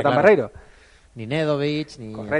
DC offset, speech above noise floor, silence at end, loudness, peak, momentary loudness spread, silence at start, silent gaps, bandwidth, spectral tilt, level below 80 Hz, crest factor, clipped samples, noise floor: under 0.1%; 30 dB; 0 s; -20 LUFS; -2 dBFS; 18 LU; 0 s; none; 10 kHz; -7 dB/octave; -54 dBFS; 20 dB; under 0.1%; -51 dBFS